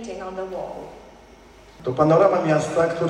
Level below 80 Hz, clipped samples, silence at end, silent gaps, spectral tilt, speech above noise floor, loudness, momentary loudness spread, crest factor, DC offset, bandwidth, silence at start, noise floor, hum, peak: -54 dBFS; under 0.1%; 0 s; none; -6.5 dB/octave; 27 dB; -21 LUFS; 18 LU; 18 dB; under 0.1%; 11 kHz; 0 s; -47 dBFS; none; -4 dBFS